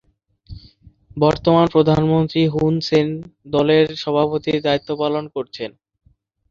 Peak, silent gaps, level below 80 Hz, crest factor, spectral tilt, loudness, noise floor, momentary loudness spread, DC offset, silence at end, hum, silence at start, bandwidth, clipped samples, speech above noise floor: -2 dBFS; none; -46 dBFS; 18 dB; -7.5 dB/octave; -18 LUFS; -49 dBFS; 14 LU; under 0.1%; 0.8 s; none; 0.5 s; 7.4 kHz; under 0.1%; 31 dB